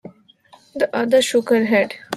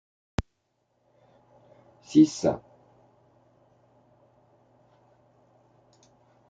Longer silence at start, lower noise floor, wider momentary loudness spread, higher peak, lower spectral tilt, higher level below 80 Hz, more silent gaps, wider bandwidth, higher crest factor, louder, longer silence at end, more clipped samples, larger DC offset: second, 0.05 s vs 0.4 s; second, -51 dBFS vs -75 dBFS; second, 7 LU vs 17 LU; first, -4 dBFS vs -8 dBFS; second, -4 dB/octave vs -6.5 dB/octave; second, -66 dBFS vs -54 dBFS; neither; first, 14 kHz vs 7.8 kHz; second, 16 dB vs 24 dB; first, -18 LUFS vs -25 LUFS; second, 0 s vs 3.9 s; neither; neither